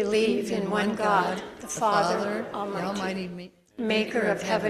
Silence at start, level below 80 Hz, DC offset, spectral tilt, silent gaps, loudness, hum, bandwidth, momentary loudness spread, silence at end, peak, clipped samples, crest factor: 0 s; -62 dBFS; under 0.1%; -4.5 dB/octave; none; -27 LUFS; none; 14.5 kHz; 11 LU; 0 s; -10 dBFS; under 0.1%; 18 dB